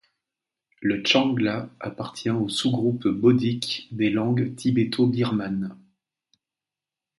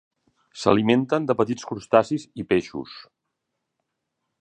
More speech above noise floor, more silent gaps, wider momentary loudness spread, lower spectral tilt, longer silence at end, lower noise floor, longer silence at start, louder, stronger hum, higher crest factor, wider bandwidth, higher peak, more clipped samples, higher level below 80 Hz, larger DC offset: first, 66 dB vs 58 dB; neither; second, 11 LU vs 15 LU; about the same, -6 dB/octave vs -6 dB/octave; about the same, 1.45 s vs 1.4 s; first, -89 dBFS vs -80 dBFS; first, 0.8 s vs 0.55 s; about the same, -24 LUFS vs -22 LUFS; neither; about the same, 20 dB vs 24 dB; first, 11.5 kHz vs 9.8 kHz; second, -6 dBFS vs -2 dBFS; neither; about the same, -62 dBFS vs -58 dBFS; neither